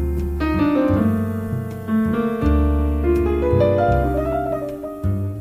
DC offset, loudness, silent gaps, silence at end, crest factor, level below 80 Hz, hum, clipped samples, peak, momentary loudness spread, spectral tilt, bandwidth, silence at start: under 0.1%; -20 LUFS; none; 0 s; 14 dB; -26 dBFS; none; under 0.1%; -6 dBFS; 8 LU; -9 dB/octave; 15.5 kHz; 0 s